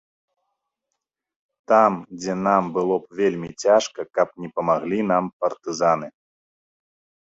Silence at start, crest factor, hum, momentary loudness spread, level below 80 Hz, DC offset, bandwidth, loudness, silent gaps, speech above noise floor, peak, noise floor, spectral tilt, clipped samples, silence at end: 1.7 s; 20 dB; none; 9 LU; -64 dBFS; under 0.1%; 8 kHz; -22 LUFS; 5.33-5.40 s; 60 dB; -2 dBFS; -82 dBFS; -5.5 dB/octave; under 0.1%; 1.15 s